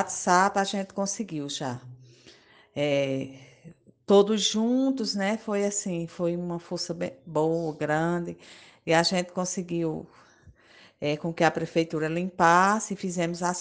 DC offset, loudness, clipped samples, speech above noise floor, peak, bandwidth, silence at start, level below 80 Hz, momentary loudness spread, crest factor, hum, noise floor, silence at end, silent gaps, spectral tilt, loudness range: under 0.1%; -26 LUFS; under 0.1%; 30 dB; -6 dBFS; 10 kHz; 0 s; -64 dBFS; 12 LU; 22 dB; none; -56 dBFS; 0 s; none; -4.5 dB/octave; 4 LU